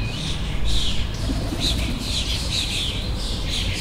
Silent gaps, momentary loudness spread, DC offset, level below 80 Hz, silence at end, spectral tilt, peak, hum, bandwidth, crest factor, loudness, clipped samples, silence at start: none; 4 LU; under 0.1%; -28 dBFS; 0 s; -3.5 dB/octave; -8 dBFS; none; 16 kHz; 14 dB; -24 LUFS; under 0.1%; 0 s